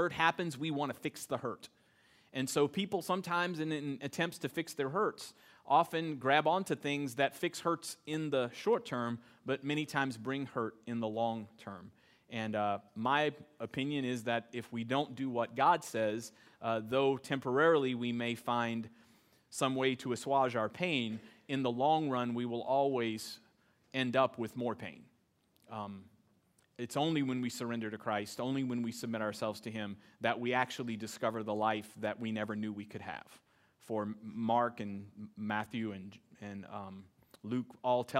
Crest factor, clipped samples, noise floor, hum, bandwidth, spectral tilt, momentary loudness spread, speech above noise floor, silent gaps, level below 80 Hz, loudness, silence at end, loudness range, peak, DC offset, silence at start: 24 dB; under 0.1%; -73 dBFS; none; 16 kHz; -5 dB/octave; 14 LU; 38 dB; none; -80 dBFS; -35 LUFS; 0 s; 5 LU; -12 dBFS; under 0.1%; 0 s